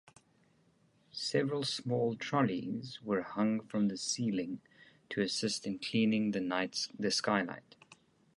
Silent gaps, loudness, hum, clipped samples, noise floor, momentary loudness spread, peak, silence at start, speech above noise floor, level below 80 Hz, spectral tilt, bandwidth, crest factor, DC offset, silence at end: none; -34 LUFS; none; under 0.1%; -70 dBFS; 10 LU; -14 dBFS; 1.15 s; 36 dB; -74 dBFS; -4.5 dB/octave; 11.5 kHz; 22 dB; under 0.1%; 0.8 s